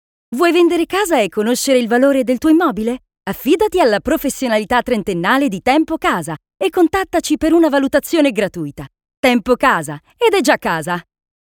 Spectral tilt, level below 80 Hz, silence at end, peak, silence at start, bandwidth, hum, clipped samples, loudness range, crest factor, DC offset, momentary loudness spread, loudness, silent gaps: -4.5 dB/octave; -44 dBFS; 0.55 s; 0 dBFS; 0.3 s; 19 kHz; none; under 0.1%; 2 LU; 16 dB; under 0.1%; 9 LU; -15 LUFS; 9.17-9.23 s